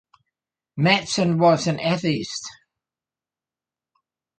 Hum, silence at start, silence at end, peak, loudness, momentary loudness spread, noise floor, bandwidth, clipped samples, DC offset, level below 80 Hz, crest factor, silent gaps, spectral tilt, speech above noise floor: none; 0.75 s; 1.9 s; -4 dBFS; -21 LUFS; 15 LU; under -90 dBFS; 9.2 kHz; under 0.1%; under 0.1%; -62 dBFS; 20 dB; none; -5 dB/octave; over 70 dB